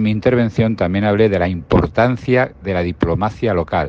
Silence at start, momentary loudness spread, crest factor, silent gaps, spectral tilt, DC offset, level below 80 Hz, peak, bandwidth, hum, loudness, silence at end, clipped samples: 0 s; 5 LU; 16 dB; none; -8.5 dB/octave; under 0.1%; -36 dBFS; 0 dBFS; 7.4 kHz; none; -17 LUFS; 0 s; under 0.1%